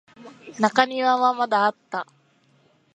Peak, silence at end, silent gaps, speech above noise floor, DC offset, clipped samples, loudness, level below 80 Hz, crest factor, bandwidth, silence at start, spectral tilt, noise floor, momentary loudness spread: 0 dBFS; 0.9 s; none; 40 dB; under 0.1%; under 0.1%; -22 LUFS; -72 dBFS; 22 dB; 9.8 kHz; 0.2 s; -4 dB/octave; -61 dBFS; 14 LU